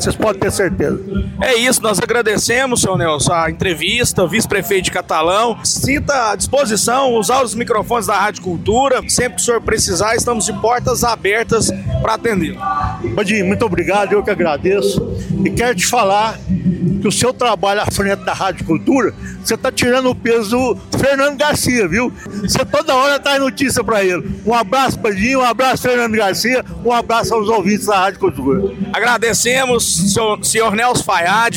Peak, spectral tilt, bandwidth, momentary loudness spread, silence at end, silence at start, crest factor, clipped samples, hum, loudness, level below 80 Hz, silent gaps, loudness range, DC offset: -2 dBFS; -3.5 dB/octave; 17 kHz; 5 LU; 0 s; 0 s; 12 dB; under 0.1%; none; -15 LUFS; -36 dBFS; none; 2 LU; under 0.1%